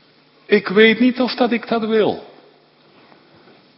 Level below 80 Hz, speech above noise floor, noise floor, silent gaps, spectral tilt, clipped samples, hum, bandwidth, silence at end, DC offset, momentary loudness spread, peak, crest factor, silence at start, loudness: -66 dBFS; 36 dB; -52 dBFS; none; -8.5 dB/octave; under 0.1%; none; 5.8 kHz; 1.55 s; under 0.1%; 8 LU; 0 dBFS; 18 dB; 0.5 s; -16 LUFS